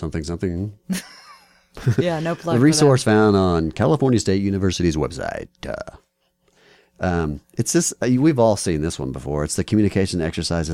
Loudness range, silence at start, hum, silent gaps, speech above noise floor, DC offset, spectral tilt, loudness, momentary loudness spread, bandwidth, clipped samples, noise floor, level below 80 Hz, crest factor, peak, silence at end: 7 LU; 0 s; none; none; 46 dB; under 0.1%; -5.5 dB/octave; -20 LUFS; 13 LU; 16 kHz; under 0.1%; -65 dBFS; -40 dBFS; 16 dB; -4 dBFS; 0 s